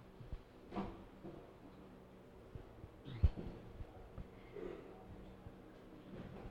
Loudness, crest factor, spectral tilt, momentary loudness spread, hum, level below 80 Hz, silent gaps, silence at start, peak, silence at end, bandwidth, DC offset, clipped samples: -50 LUFS; 26 dB; -8.5 dB/octave; 19 LU; none; -50 dBFS; none; 0 s; -20 dBFS; 0 s; 7.2 kHz; under 0.1%; under 0.1%